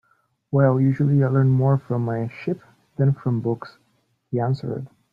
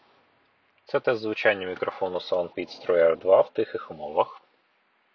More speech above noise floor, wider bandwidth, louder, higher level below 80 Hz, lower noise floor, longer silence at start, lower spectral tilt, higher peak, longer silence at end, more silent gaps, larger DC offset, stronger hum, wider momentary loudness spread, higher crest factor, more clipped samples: first, 47 dB vs 43 dB; second, 5 kHz vs 6.4 kHz; first, -22 LUFS vs -25 LUFS; first, -60 dBFS vs -66 dBFS; about the same, -67 dBFS vs -67 dBFS; second, 0.5 s vs 0.9 s; first, -11 dB/octave vs -6 dB/octave; about the same, -4 dBFS vs -6 dBFS; second, 0.25 s vs 0.75 s; neither; neither; neither; about the same, 13 LU vs 11 LU; about the same, 18 dB vs 20 dB; neither